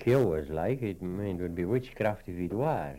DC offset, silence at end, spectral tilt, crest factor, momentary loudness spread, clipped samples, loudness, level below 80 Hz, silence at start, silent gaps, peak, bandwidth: under 0.1%; 0 s; -8.5 dB/octave; 16 dB; 7 LU; under 0.1%; -31 LUFS; -52 dBFS; 0 s; none; -14 dBFS; 16.5 kHz